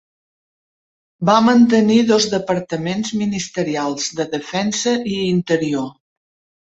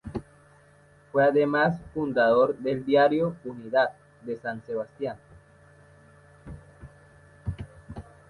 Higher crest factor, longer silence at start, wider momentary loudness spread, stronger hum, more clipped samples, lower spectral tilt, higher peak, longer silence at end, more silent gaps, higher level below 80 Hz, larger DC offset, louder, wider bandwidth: about the same, 18 dB vs 18 dB; first, 1.2 s vs 0.05 s; second, 10 LU vs 23 LU; neither; neither; second, -4.5 dB/octave vs -8 dB/octave; first, -2 dBFS vs -8 dBFS; first, 0.8 s vs 0.3 s; neither; about the same, -56 dBFS vs -52 dBFS; neither; first, -17 LUFS vs -25 LUFS; second, 8 kHz vs 11 kHz